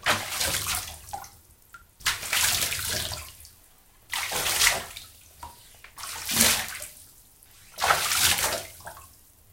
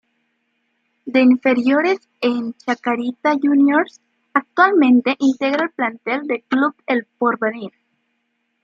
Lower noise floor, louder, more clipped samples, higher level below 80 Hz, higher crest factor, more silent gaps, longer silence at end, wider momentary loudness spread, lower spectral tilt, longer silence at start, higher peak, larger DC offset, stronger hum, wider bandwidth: second, -56 dBFS vs -70 dBFS; second, -24 LUFS vs -18 LUFS; neither; first, -50 dBFS vs -72 dBFS; first, 30 dB vs 16 dB; neither; second, 0.45 s vs 0.95 s; first, 23 LU vs 10 LU; second, -0.5 dB/octave vs -5.5 dB/octave; second, 0 s vs 1.05 s; about the same, 0 dBFS vs -2 dBFS; neither; neither; first, 17 kHz vs 7.4 kHz